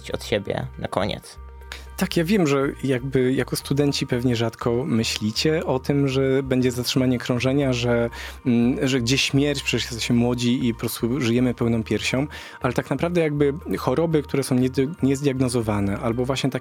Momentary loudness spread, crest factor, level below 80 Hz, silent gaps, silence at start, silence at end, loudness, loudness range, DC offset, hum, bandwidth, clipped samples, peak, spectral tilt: 6 LU; 20 dB; -44 dBFS; none; 0 s; 0 s; -22 LUFS; 2 LU; under 0.1%; none; 17 kHz; under 0.1%; -2 dBFS; -5.5 dB/octave